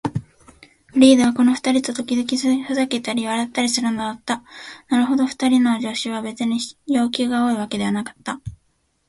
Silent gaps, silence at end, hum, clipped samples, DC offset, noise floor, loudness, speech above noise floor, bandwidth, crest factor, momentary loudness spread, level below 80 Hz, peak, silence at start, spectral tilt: none; 0.6 s; none; under 0.1%; under 0.1%; -66 dBFS; -20 LUFS; 47 dB; 11.5 kHz; 20 dB; 13 LU; -54 dBFS; 0 dBFS; 0.05 s; -4 dB/octave